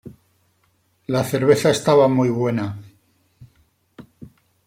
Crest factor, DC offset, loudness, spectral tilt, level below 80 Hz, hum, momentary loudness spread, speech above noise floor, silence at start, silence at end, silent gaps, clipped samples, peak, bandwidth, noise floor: 20 dB; under 0.1%; -18 LUFS; -6 dB/octave; -60 dBFS; none; 15 LU; 47 dB; 0.05 s; 0.4 s; none; under 0.1%; -2 dBFS; 16.5 kHz; -64 dBFS